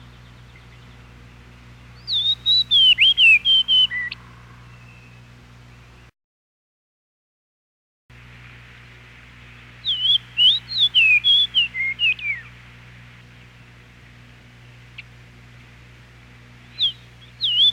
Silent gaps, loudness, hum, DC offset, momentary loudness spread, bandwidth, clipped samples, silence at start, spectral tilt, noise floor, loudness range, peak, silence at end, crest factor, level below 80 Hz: 6.24-8.09 s; -15 LUFS; 60 Hz at -50 dBFS; under 0.1%; 15 LU; 14.5 kHz; under 0.1%; 2.05 s; -1 dB/octave; -46 dBFS; 15 LU; -6 dBFS; 0 s; 16 dB; -52 dBFS